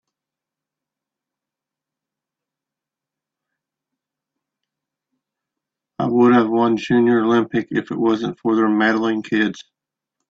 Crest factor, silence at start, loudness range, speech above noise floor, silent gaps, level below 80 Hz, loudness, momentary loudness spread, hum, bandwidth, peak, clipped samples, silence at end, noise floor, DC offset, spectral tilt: 18 dB; 6 s; 5 LU; 70 dB; none; -64 dBFS; -18 LUFS; 9 LU; none; 7.4 kHz; -4 dBFS; under 0.1%; 0.7 s; -87 dBFS; under 0.1%; -7 dB/octave